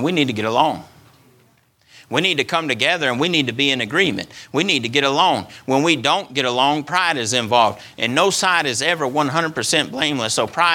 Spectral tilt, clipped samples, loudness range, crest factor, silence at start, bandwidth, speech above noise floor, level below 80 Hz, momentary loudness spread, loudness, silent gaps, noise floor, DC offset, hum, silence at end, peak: -3 dB/octave; under 0.1%; 3 LU; 18 dB; 0 s; 18.5 kHz; 38 dB; -62 dBFS; 4 LU; -18 LUFS; none; -57 dBFS; under 0.1%; none; 0 s; 0 dBFS